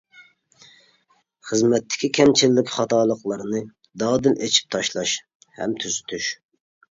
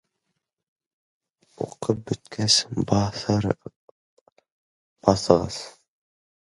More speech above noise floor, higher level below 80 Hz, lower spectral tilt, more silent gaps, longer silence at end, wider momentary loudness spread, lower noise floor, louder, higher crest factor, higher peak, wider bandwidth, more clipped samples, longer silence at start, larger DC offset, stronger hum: second, 43 dB vs 56 dB; second, -60 dBFS vs -50 dBFS; about the same, -3.5 dB/octave vs -4.5 dB/octave; second, 5.35-5.40 s vs 3.76-4.26 s, 4.32-4.36 s, 4.52-4.96 s; second, 0.6 s vs 0.8 s; second, 12 LU vs 15 LU; second, -64 dBFS vs -80 dBFS; about the same, -21 LUFS vs -23 LUFS; second, 20 dB vs 26 dB; about the same, -2 dBFS vs 0 dBFS; second, 7.8 kHz vs 11.5 kHz; neither; second, 0.2 s vs 1.6 s; neither; neither